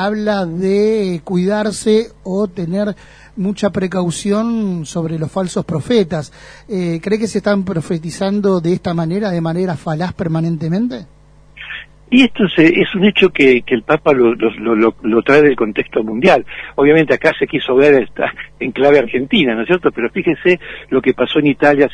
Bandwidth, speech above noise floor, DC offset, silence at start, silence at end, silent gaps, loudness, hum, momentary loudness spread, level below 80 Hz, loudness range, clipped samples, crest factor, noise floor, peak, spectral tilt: 10.5 kHz; 24 dB; under 0.1%; 0 s; 0 s; none; -15 LUFS; none; 10 LU; -46 dBFS; 6 LU; under 0.1%; 14 dB; -38 dBFS; 0 dBFS; -6 dB/octave